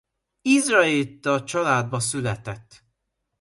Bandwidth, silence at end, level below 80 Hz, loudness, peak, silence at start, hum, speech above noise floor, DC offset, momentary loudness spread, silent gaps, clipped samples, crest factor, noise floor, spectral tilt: 11.5 kHz; 0.8 s; -58 dBFS; -22 LUFS; -4 dBFS; 0.45 s; none; 55 dB; under 0.1%; 14 LU; none; under 0.1%; 20 dB; -77 dBFS; -4 dB/octave